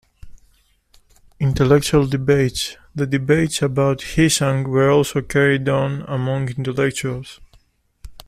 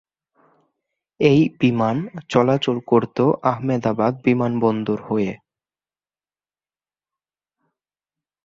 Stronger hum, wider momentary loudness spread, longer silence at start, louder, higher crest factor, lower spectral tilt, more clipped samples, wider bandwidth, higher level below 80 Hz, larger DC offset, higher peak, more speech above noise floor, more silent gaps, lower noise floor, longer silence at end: neither; first, 10 LU vs 7 LU; second, 0.25 s vs 1.2 s; about the same, -18 LUFS vs -20 LUFS; about the same, 16 dB vs 20 dB; second, -5.5 dB/octave vs -7.5 dB/octave; neither; first, 15 kHz vs 7.6 kHz; first, -42 dBFS vs -58 dBFS; neither; about the same, -4 dBFS vs -2 dBFS; second, 40 dB vs over 71 dB; neither; second, -58 dBFS vs under -90 dBFS; second, 0.15 s vs 3.1 s